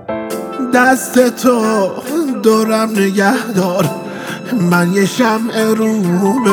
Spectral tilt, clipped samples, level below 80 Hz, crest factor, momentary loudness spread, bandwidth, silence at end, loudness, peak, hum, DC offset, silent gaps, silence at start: -5.5 dB/octave; under 0.1%; -60 dBFS; 14 dB; 9 LU; over 20 kHz; 0 s; -14 LUFS; 0 dBFS; none; under 0.1%; none; 0 s